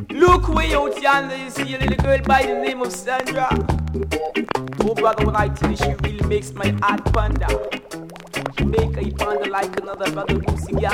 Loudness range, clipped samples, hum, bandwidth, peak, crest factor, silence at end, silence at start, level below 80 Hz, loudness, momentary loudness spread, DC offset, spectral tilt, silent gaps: 3 LU; under 0.1%; none; 16.5 kHz; -2 dBFS; 18 dB; 0 s; 0 s; -28 dBFS; -20 LUFS; 9 LU; under 0.1%; -6 dB/octave; none